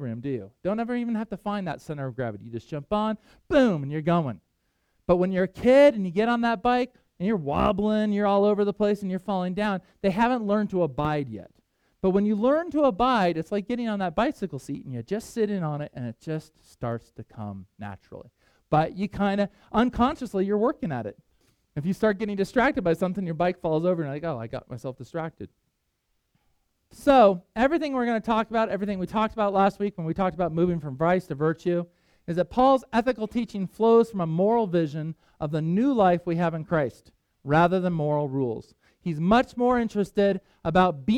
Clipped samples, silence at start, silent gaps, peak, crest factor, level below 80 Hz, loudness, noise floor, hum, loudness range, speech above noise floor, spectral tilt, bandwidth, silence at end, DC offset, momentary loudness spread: under 0.1%; 0 s; none; -6 dBFS; 20 dB; -50 dBFS; -25 LUFS; -75 dBFS; none; 7 LU; 51 dB; -7.5 dB/octave; 13 kHz; 0 s; under 0.1%; 14 LU